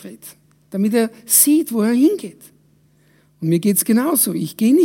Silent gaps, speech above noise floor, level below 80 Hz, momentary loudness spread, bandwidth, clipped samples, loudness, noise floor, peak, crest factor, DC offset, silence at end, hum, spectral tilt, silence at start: none; 39 dB; -70 dBFS; 14 LU; 16.5 kHz; under 0.1%; -16 LUFS; -56 dBFS; 0 dBFS; 18 dB; under 0.1%; 0 s; none; -4.5 dB/octave; 0.05 s